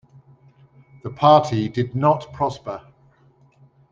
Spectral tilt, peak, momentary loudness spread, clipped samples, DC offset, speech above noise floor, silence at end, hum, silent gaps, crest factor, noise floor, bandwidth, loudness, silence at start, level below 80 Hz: -7.5 dB/octave; -2 dBFS; 21 LU; under 0.1%; under 0.1%; 37 dB; 1.15 s; none; none; 20 dB; -56 dBFS; 7.6 kHz; -19 LUFS; 1.05 s; -58 dBFS